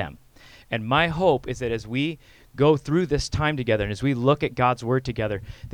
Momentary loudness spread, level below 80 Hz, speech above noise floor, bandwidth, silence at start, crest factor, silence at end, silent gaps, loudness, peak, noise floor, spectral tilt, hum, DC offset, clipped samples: 10 LU; -42 dBFS; 27 dB; 14 kHz; 0 s; 18 dB; 0.05 s; none; -24 LUFS; -6 dBFS; -50 dBFS; -6 dB/octave; none; under 0.1%; under 0.1%